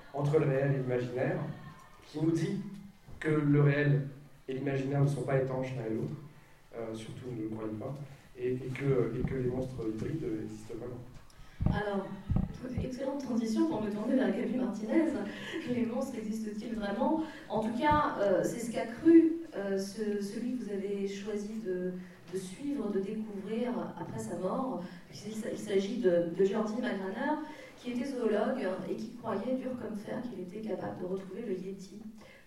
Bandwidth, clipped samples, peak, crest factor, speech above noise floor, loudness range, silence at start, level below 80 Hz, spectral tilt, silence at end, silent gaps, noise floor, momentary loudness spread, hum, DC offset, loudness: 13 kHz; under 0.1%; -12 dBFS; 20 dB; 22 dB; 8 LU; 0 s; -54 dBFS; -7.5 dB/octave; 0.05 s; none; -55 dBFS; 13 LU; none; under 0.1%; -33 LUFS